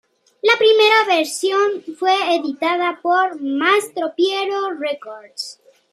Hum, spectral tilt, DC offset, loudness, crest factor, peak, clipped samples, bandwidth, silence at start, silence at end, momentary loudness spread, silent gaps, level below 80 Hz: none; -1 dB/octave; under 0.1%; -17 LUFS; 16 dB; -2 dBFS; under 0.1%; 13.5 kHz; 0.45 s; 0.4 s; 16 LU; none; -80 dBFS